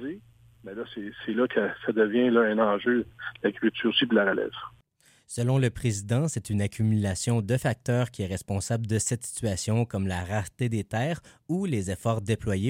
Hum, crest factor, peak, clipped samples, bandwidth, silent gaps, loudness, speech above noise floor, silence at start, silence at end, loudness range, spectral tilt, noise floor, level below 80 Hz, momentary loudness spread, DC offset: none; 18 dB; -8 dBFS; under 0.1%; 16 kHz; none; -27 LUFS; 36 dB; 0 s; 0 s; 4 LU; -5.5 dB/octave; -62 dBFS; -54 dBFS; 13 LU; under 0.1%